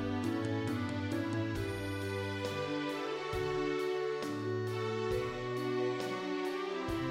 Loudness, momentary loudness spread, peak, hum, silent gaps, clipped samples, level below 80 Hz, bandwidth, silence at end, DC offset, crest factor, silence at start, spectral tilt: -36 LUFS; 3 LU; -24 dBFS; none; none; under 0.1%; -56 dBFS; 16 kHz; 0 s; under 0.1%; 12 dB; 0 s; -6 dB/octave